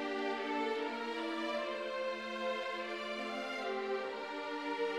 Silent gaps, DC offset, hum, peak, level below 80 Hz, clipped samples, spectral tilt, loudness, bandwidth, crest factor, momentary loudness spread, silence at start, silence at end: none; under 0.1%; none; -26 dBFS; -80 dBFS; under 0.1%; -3.5 dB/octave; -38 LUFS; 13.5 kHz; 12 dB; 3 LU; 0 s; 0 s